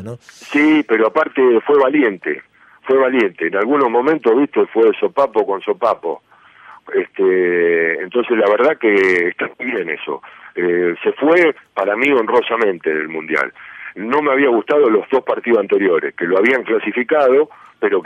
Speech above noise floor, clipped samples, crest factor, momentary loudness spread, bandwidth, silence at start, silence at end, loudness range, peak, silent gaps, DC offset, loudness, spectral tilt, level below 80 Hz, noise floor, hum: 27 dB; under 0.1%; 14 dB; 10 LU; 8 kHz; 0 s; 0 s; 2 LU; -2 dBFS; none; under 0.1%; -15 LUFS; -6 dB/octave; -64 dBFS; -43 dBFS; none